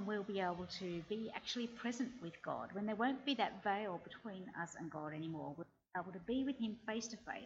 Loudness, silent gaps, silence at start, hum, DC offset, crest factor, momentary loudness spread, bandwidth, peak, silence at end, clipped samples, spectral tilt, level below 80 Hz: -43 LUFS; none; 0 s; none; under 0.1%; 20 dB; 9 LU; 8 kHz; -22 dBFS; 0 s; under 0.1%; -4.5 dB/octave; -74 dBFS